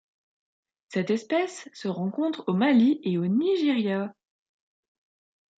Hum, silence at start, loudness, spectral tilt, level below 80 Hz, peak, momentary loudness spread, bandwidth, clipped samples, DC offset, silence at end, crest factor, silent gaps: none; 0.9 s; -26 LUFS; -6.5 dB/octave; -76 dBFS; -12 dBFS; 12 LU; 9 kHz; under 0.1%; under 0.1%; 1.5 s; 16 dB; none